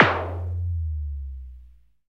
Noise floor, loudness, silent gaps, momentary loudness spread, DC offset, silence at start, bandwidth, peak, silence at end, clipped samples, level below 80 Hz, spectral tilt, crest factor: -50 dBFS; -28 LUFS; none; 15 LU; 0.2%; 0 s; 6.6 kHz; 0 dBFS; 0.4 s; under 0.1%; -34 dBFS; -7 dB/octave; 26 dB